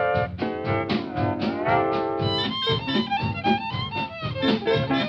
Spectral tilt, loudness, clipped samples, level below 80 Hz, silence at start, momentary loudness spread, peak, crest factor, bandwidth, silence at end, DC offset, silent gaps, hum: -7 dB/octave; -25 LUFS; under 0.1%; -48 dBFS; 0 s; 6 LU; -8 dBFS; 16 dB; 8 kHz; 0 s; under 0.1%; none; none